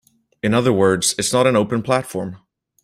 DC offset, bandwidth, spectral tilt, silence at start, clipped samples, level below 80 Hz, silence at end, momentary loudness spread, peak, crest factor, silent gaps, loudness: under 0.1%; 16 kHz; -4.5 dB/octave; 0.45 s; under 0.1%; -54 dBFS; 0.45 s; 12 LU; -2 dBFS; 18 dB; none; -18 LUFS